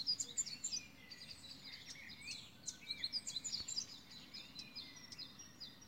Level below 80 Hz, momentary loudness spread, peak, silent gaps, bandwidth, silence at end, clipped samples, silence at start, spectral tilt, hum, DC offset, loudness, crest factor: -76 dBFS; 12 LU; -28 dBFS; none; 16 kHz; 0 s; under 0.1%; 0 s; 0.5 dB/octave; none; under 0.1%; -45 LUFS; 20 dB